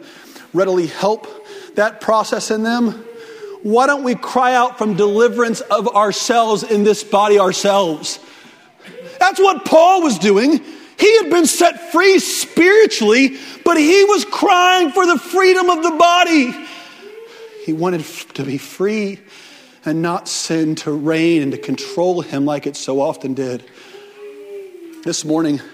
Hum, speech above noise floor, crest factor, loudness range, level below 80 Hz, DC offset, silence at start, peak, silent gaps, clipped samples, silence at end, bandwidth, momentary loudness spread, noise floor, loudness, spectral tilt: none; 29 dB; 16 dB; 9 LU; -64 dBFS; under 0.1%; 0 s; 0 dBFS; none; under 0.1%; 0.05 s; 16 kHz; 17 LU; -44 dBFS; -15 LUFS; -4 dB/octave